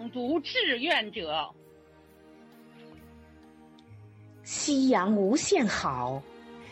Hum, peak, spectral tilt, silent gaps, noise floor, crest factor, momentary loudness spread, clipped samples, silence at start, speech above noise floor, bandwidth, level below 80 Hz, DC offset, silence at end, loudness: none; -14 dBFS; -3.5 dB/octave; none; -56 dBFS; 16 dB; 16 LU; under 0.1%; 0 s; 29 dB; 9.6 kHz; -64 dBFS; under 0.1%; 0 s; -27 LUFS